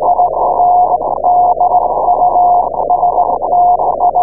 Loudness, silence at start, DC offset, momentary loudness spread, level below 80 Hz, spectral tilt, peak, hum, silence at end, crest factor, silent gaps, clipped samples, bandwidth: -11 LUFS; 0 s; 2%; 3 LU; -40 dBFS; -16.5 dB/octave; 0 dBFS; none; 0 s; 10 dB; none; under 0.1%; 1.2 kHz